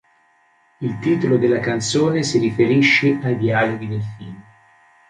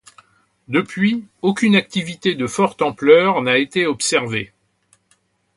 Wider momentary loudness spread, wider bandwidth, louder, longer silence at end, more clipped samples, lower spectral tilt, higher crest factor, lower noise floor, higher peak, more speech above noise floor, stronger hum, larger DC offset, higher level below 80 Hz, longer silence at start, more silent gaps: first, 14 LU vs 9 LU; about the same, 11 kHz vs 11.5 kHz; about the same, -18 LUFS vs -17 LUFS; second, 0.7 s vs 1.1 s; neither; about the same, -5.5 dB/octave vs -4.5 dB/octave; about the same, 16 dB vs 18 dB; second, -58 dBFS vs -62 dBFS; about the same, -2 dBFS vs 0 dBFS; second, 40 dB vs 45 dB; neither; neither; about the same, -56 dBFS vs -60 dBFS; about the same, 0.8 s vs 0.7 s; neither